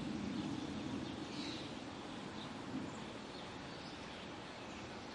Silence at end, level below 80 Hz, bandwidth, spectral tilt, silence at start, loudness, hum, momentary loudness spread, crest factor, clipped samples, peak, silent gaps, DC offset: 0 s; -68 dBFS; 11.5 kHz; -5 dB/octave; 0 s; -46 LUFS; none; 6 LU; 14 dB; under 0.1%; -32 dBFS; none; under 0.1%